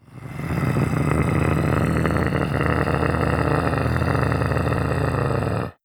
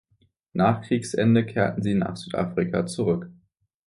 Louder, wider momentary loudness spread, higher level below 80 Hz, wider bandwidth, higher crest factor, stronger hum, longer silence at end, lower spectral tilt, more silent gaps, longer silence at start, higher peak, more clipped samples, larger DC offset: about the same, -22 LUFS vs -24 LUFS; second, 3 LU vs 8 LU; first, -34 dBFS vs -54 dBFS; first, 17.5 kHz vs 11.5 kHz; about the same, 18 dB vs 18 dB; neither; second, 0.15 s vs 0.55 s; about the same, -7.5 dB/octave vs -7 dB/octave; neither; second, 0.1 s vs 0.55 s; about the same, -4 dBFS vs -6 dBFS; neither; neither